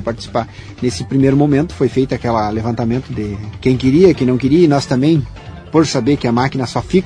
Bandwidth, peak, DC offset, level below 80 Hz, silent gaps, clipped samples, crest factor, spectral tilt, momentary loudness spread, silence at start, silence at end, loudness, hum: 10.5 kHz; 0 dBFS; under 0.1%; -36 dBFS; none; under 0.1%; 14 dB; -7 dB/octave; 10 LU; 0 s; 0 s; -15 LUFS; none